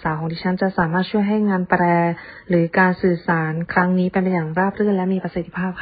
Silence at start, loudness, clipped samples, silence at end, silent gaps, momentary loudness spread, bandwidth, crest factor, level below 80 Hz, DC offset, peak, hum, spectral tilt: 0 s; -19 LUFS; under 0.1%; 0 s; none; 7 LU; 4.9 kHz; 16 dB; -50 dBFS; under 0.1%; -2 dBFS; none; -12.5 dB/octave